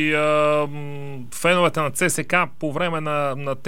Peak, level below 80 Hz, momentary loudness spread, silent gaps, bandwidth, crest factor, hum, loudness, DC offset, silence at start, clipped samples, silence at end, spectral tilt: -2 dBFS; -62 dBFS; 14 LU; none; 16.5 kHz; 18 dB; none; -21 LUFS; 2%; 0 s; under 0.1%; 0 s; -4.5 dB/octave